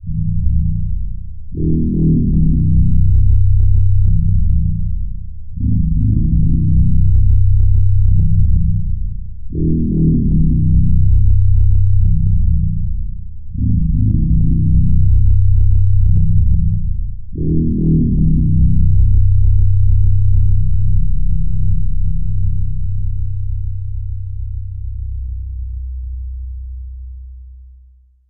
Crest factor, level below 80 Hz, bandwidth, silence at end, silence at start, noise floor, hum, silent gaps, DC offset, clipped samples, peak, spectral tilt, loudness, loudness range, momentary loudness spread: 12 dB; -16 dBFS; 0.6 kHz; 0 s; 0 s; -46 dBFS; none; none; 7%; under 0.1%; -2 dBFS; -18 dB/octave; -16 LUFS; 10 LU; 13 LU